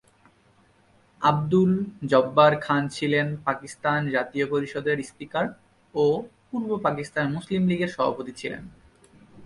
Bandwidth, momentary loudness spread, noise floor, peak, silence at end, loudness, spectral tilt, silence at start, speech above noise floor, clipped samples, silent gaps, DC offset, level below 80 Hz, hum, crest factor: 11.5 kHz; 11 LU; -60 dBFS; -4 dBFS; 0 s; -25 LUFS; -6.5 dB/octave; 1.2 s; 36 dB; under 0.1%; none; under 0.1%; -60 dBFS; none; 22 dB